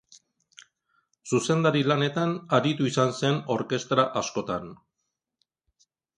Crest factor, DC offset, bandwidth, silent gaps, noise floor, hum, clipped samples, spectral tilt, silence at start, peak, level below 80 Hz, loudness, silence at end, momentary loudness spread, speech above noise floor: 20 dB; under 0.1%; 11.5 kHz; none; -82 dBFS; none; under 0.1%; -5.5 dB/octave; 1.25 s; -6 dBFS; -66 dBFS; -25 LUFS; 1.45 s; 9 LU; 57 dB